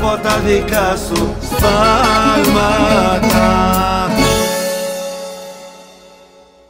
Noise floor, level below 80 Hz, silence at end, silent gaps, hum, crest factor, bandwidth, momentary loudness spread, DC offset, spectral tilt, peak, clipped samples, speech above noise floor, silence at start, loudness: -44 dBFS; -26 dBFS; 0.85 s; none; none; 14 dB; 16.5 kHz; 13 LU; under 0.1%; -4.5 dB/octave; 0 dBFS; under 0.1%; 31 dB; 0 s; -13 LUFS